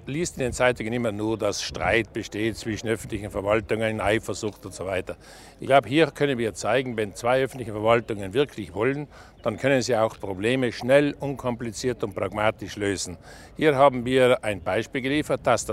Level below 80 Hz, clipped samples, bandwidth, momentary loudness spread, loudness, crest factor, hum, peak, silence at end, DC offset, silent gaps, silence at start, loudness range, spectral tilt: -50 dBFS; under 0.1%; 15.5 kHz; 11 LU; -25 LUFS; 22 dB; none; -2 dBFS; 0 s; under 0.1%; none; 0 s; 3 LU; -5 dB/octave